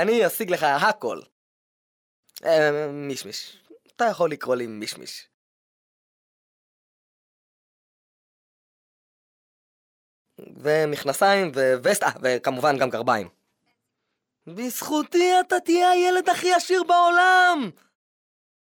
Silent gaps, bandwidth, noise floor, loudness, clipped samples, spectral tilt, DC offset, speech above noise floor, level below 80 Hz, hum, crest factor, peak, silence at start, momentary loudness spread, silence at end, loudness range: 1.32-2.23 s, 5.34-10.25 s; 19 kHz; -80 dBFS; -21 LUFS; under 0.1%; -3.5 dB/octave; under 0.1%; 58 dB; -76 dBFS; none; 18 dB; -6 dBFS; 0 s; 15 LU; 0.9 s; 11 LU